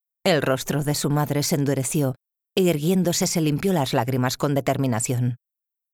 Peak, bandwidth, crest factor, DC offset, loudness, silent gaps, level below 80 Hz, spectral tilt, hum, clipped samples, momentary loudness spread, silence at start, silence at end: -6 dBFS; 19 kHz; 16 dB; under 0.1%; -23 LUFS; none; -54 dBFS; -5 dB/octave; none; under 0.1%; 5 LU; 0.25 s; 0.55 s